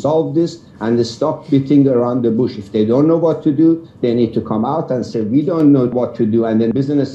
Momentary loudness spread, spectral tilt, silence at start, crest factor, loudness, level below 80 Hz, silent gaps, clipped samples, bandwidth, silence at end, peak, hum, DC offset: 6 LU; -8.5 dB/octave; 0 s; 14 dB; -15 LUFS; -54 dBFS; none; under 0.1%; 8 kHz; 0 s; -2 dBFS; none; under 0.1%